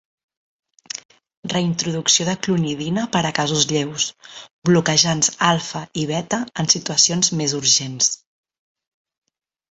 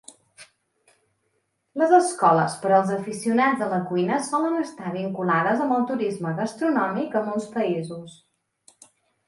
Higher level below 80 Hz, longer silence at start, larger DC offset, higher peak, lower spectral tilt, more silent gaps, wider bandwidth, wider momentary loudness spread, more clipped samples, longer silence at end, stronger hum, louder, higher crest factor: first, -58 dBFS vs -72 dBFS; first, 0.95 s vs 0.4 s; neither; first, 0 dBFS vs -4 dBFS; second, -3 dB/octave vs -6 dB/octave; first, 1.05-1.09 s, 1.37-1.43 s, 4.51-4.62 s vs none; second, 8.2 kHz vs 11.5 kHz; first, 15 LU vs 10 LU; neither; first, 1.55 s vs 1.15 s; neither; first, -18 LUFS vs -23 LUFS; about the same, 20 dB vs 20 dB